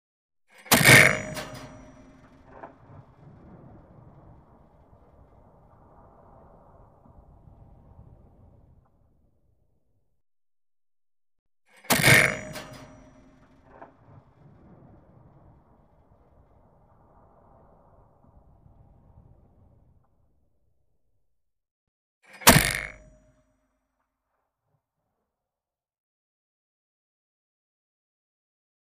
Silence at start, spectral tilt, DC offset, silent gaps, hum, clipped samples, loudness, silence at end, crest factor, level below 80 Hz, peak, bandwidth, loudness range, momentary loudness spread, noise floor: 0.7 s; -3 dB/octave; under 0.1%; 11.39-11.46 s, 21.71-22.21 s; none; under 0.1%; -18 LUFS; 5.95 s; 30 dB; -50 dBFS; -2 dBFS; 15 kHz; 18 LU; 27 LU; under -90 dBFS